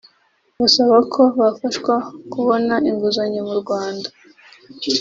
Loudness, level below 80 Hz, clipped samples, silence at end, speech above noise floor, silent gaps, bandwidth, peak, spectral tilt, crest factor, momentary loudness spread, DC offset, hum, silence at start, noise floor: -17 LUFS; -60 dBFS; under 0.1%; 0 s; 44 dB; none; 7.6 kHz; -2 dBFS; -4 dB/octave; 18 dB; 13 LU; under 0.1%; none; 0.6 s; -61 dBFS